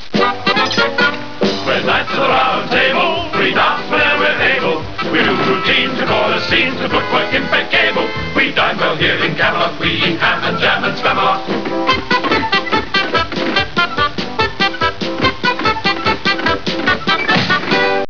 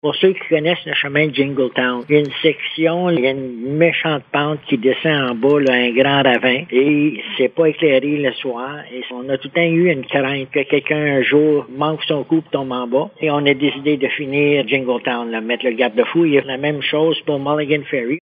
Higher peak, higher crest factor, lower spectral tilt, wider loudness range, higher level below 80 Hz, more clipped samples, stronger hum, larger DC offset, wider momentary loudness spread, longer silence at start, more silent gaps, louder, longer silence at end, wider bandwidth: about the same, 0 dBFS vs 0 dBFS; about the same, 16 dB vs 16 dB; second, -4.5 dB/octave vs -8 dB/octave; about the same, 2 LU vs 3 LU; first, -42 dBFS vs -66 dBFS; neither; neither; first, 4% vs under 0.1%; second, 4 LU vs 7 LU; about the same, 0 s vs 0.05 s; neither; first, -14 LUFS vs -17 LUFS; about the same, 0 s vs 0 s; second, 5.4 kHz vs 6.4 kHz